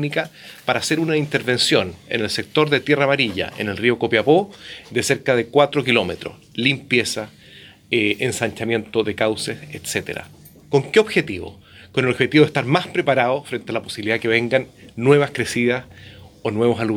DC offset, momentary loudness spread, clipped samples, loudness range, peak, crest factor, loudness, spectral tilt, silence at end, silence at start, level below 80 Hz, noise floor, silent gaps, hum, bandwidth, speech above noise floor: under 0.1%; 11 LU; under 0.1%; 3 LU; -2 dBFS; 18 dB; -19 LUFS; -4.5 dB/octave; 0 s; 0 s; -56 dBFS; -45 dBFS; none; none; 19 kHz; 25 dB